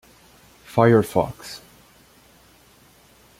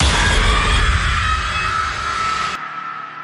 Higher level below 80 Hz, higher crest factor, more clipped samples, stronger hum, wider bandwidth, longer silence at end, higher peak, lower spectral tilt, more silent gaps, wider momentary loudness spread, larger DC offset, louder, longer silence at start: second, -56 dBFS vs -22 dBFS; first, 22 dB vs 14 dB; neither; neither; first, 16 kHz vs 11.5 kHz; first, 1.85 s vs 0 s; about the same, -2 dBFS vs -4 dBFS; first, -7 dB/octave vs -3 dB/octave; neither; first, 21 LU vs 11 LU; neither; about the same, -19 LUFS vs -17 LUFS; first, 0.75 s vs 0 s